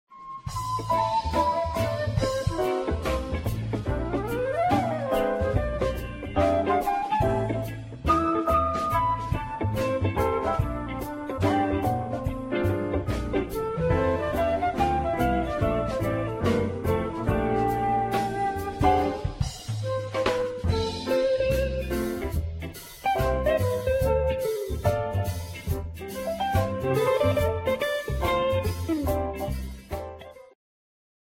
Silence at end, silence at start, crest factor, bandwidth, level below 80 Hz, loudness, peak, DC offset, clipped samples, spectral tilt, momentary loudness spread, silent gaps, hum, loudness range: 0.8 s; 0.1 s; 18 dB; 16.5 kHz; -38 dBFS; -27 LUFS; -8 dBFS; under 0.1%; under 0.1%; -6.5 dB/octave; 8 LU; none; none; 2 LU